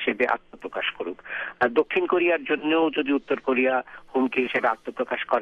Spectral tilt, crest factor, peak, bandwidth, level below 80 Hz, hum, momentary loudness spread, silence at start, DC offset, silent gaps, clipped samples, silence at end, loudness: -6 dB/octave; 16 dB; -8 dBFS; 6.6 kHz; -62 dBFS; none; 8 LU; 0 s; under 0.1%; none; under 0.1%; 0 s; -25 LUFS